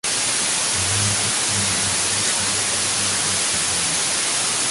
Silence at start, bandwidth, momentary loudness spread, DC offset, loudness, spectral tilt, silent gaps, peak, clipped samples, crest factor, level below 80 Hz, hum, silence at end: 0.05 s; 12 kHz; 1 LU; under 0.1%; -18 LUFS; -0.5 dB/octave; none; -6 dBFS; under 0.1%; 14 dB; -48 dBFS; none; 0 s